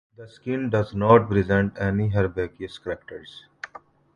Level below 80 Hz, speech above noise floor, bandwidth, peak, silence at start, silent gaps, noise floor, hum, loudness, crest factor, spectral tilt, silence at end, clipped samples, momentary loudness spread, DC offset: -46 dBFS; 25 dB; 7.2 kHz; -4 dBFS; 0.2 s; none; -48 dBFS; none; -23 LUFS; 20 dB; -8.5 dB/octave; 0.5 s; under 0.1%; 22 LU; under 0.1%